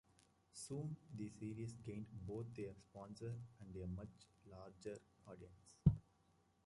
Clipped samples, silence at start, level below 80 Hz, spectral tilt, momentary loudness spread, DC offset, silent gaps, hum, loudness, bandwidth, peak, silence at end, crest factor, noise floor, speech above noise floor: under 0.1%; 0.55 s; -62 dBFS; -7.5 dB/octave; 21 LU; under 0.1%; none; none; -48 LUFS; 11 kHz; -18 dBFS; 0.65 s; 30 dB; -77 dBFS; 30 dB